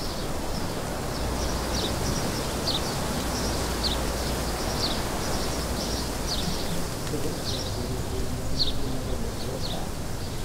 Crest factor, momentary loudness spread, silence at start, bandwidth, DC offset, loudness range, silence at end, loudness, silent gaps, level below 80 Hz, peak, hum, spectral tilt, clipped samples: 16 dB; 5 LU; 0 s; 16 kHz; under 0.1%; 3 LU; 0 s; -29 LUFS; none; -34 dBFS; -12 dBFS; none; -4 dB/octave; under 0.1%